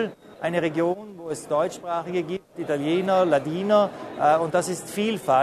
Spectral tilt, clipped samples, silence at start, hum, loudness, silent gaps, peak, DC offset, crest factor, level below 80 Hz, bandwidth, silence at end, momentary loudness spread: -5.5 dB/octave; under 0.1%; 0 s; none; -24 LUFS; none; -8 dBFS; under 0.1%; 16 dB; -66 dBFS; 13.5 kHz; 0 s; 11 LU